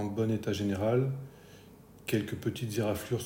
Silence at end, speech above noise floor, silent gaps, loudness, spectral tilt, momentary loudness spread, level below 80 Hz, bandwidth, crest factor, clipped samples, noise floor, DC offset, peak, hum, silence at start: 0 s; 23 dB; none; -32 LUFS; -6.5 dB/octave; 10 LU; -60 dBFS; 16.5 kHz; 16 dB; under 0.1%; -54 dBFS; under 0.1%; -16 dBFS; none; 0 s